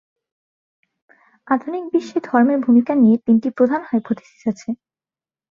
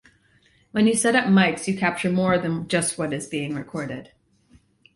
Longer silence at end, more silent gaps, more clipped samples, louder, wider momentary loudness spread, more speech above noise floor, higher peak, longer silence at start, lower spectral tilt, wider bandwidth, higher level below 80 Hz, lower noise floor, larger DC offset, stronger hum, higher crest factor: second, 0.75 s vs 0.9 s; neither; neither; first, -18 LUFS vs -22 LUFS; about the same, 13 LU vs 13 LU; first, over 73 dB vs 38 dB; about the same, -2 dBFS vs -4 dBFS; first, 1.5 s vs 0.75 s; first, -8 dB/octave vs -4.5 dB/octave; second, 7.2 kHz vs 11.5 kHz; second, -66 dBFS vs -58 dBFS; first, under -90 dBFS vs -60 dBFS; neither; neither; about the same, 18 dB vs 18 dB